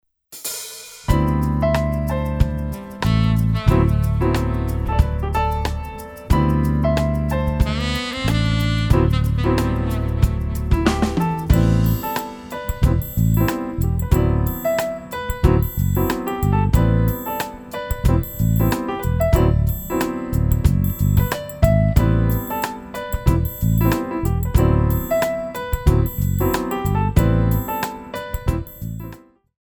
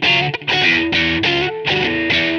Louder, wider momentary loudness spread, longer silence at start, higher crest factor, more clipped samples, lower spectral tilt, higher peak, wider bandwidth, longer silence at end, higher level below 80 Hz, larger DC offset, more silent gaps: second, -20 LUFS vs -15 LUFS; first, 10 LU vs 4 LU; first, 0.3 s vs 0 s; first, 18 dB vs 12 dB; neither; first, -7 dB/octave vs -4.5 dB/octave; first, 0 dBFS vs -4 dBFS; first, over 20 kHz vs 8.6 kHz; first, 0.45 s vs 0 s; first, -24 dBFS vs -44 dBFS; neither; neither